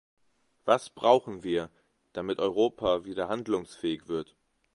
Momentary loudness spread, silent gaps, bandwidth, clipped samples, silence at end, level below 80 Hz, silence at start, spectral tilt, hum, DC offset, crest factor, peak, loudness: 13 LU; none; 11.5 kHz; under 0.1%; 0.5 s; -62 dBFS; 0.65 s; -5.5 dB/octave; none; under 0.1%; 22 dB; -6 dBFS; -29 LUFS